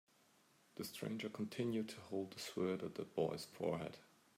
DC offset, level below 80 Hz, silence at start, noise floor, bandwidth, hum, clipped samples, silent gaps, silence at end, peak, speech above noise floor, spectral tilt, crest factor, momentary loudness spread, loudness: under 0.1%; -82 dBFS; 0.75 s; -73 dBFS; 16 kHz; none; under 0.1%; none; 0.35 s; -26 dBFS; 29 dB; -5.5 dB/octave; 20 dB; 8 LU; -44 LUFS